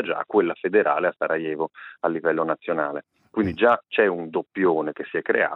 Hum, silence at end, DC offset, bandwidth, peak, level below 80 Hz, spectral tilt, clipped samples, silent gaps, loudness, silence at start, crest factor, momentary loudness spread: none; 0 s; under 0.1%; 5.4 kHz; -6 dBFS; -64 dBFS; -8.5 dB/octave; under 0.1%; none; -23 LUFS; 0 s; 18 dB; 9 LU